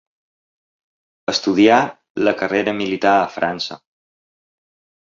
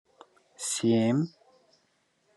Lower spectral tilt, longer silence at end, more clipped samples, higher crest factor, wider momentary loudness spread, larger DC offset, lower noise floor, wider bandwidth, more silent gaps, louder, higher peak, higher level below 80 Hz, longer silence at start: about the same, -4.5 dB/octave vs -5 dB/octave; first, 1.25 s vs 1.1 s; neither; about the same, 18 dB vs 18 dB; about the same, 12 LU vs 12 LU; neither; first, under -90 dBFS vs -71 dBFS; second, 7.6 kHz vs 12 kHz; first, 2.10-2.15 s vs none; first, -18 LUFS vs -28 LUFS; first, -2 dBFS vs -14 dBFS; first, -60 dBFS vs -78 dBFS; first, 1.3 s vs 0.6 s